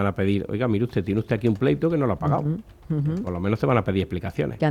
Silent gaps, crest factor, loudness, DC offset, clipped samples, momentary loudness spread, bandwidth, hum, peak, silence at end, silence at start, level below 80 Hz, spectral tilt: none; 18 dB; -24 LUFS; under 0.1%; under 0.1%; 6 LU; 12 kHz; none; -4 dBFS; 0 s; 0 s; -48 dBFS; -9 dB/octave